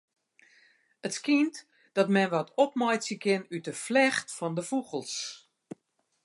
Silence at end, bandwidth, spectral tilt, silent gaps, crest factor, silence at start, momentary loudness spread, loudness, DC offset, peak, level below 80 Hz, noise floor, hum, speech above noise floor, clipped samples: 0.85 s; 11.5 kHz; -4.5 dB/octave; none; 20 dB; 1.05 s; 22 LU; -29 LUFS; under 0.1%; -10 dBFS; -82 dBFS; -76 dBFS; none; 48 dB; under 0.1%